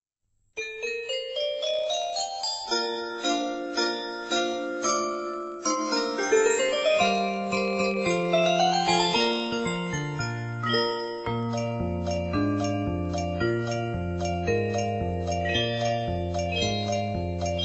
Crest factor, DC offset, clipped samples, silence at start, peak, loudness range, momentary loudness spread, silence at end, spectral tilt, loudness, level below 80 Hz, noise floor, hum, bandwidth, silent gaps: 16 dB; under 0.1%; under 0.1%; 0.55 s; -10 dBFS; 4 LU; 8 LU; 0 s; -4 dB/octave; -27 LUFS; -48 dBFS; -72 dBFS; none; 8.2 kHz; none